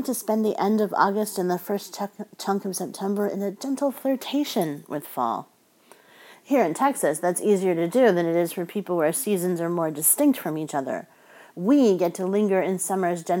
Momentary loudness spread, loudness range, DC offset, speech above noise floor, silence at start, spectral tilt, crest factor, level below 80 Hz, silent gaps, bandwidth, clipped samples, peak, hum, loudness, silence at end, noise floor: 11 LU; 5 LU; under 0.1%; 32 dB; 0 s; -5 dB/octave; 18 dB; -84 dBFS; none; 17 kHz; under 0.1%; -6 dBFS; none; -24 LUFS; 0 s; -55 dBFS